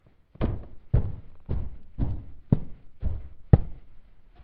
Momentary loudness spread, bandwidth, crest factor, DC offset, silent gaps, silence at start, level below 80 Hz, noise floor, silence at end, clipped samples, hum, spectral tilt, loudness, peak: 18 LU; 4.3 kHz; 28 dB; under 0.1%; none; 0.4 s; -34 dBFS; -46 dBFS; 0 s; under 0.1%; none; -10.5 dB/octave; -29 LUFS; 0 dBFS